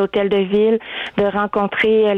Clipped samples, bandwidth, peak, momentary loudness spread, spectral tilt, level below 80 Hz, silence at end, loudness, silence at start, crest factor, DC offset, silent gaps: under 0.1%; 4.6 kHz; -8 dBFS; 5 LU; -7.5 dB/octave; -52 dBFS; 0 s; -17 LUFS; 0 s; 10 dB; under 0.1%; none